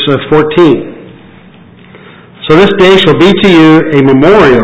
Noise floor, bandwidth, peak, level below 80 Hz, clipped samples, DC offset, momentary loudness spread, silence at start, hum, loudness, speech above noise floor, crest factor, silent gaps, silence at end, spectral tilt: -35 dBFS; 8 kHz; 0 dBFS; -36 dBFS; 7%; under 0.1%; 5 LU; 0 s; none; -5 LUFS; 30 dB; 6 dB; none; 0 s; -7 dB/octave